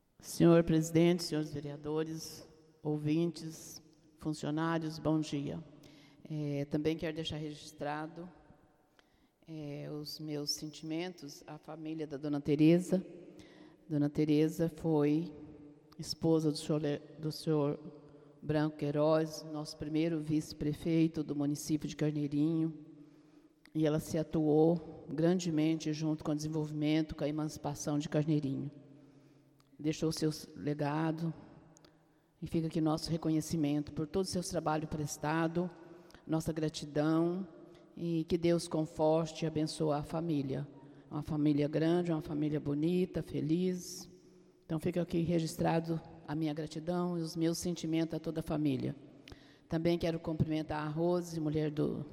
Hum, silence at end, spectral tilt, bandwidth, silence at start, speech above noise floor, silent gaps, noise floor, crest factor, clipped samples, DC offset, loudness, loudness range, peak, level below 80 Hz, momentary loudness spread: none; 0 s; -6.5 dB/octave; 15.5 kHz; 0.2 s; 35 dB; none; -69 dBFS; 22 dB; under 0.1%; under 0.1%; -34 LUFS; 6 LU; -14 dBFS; -62 dBFS; 14 LU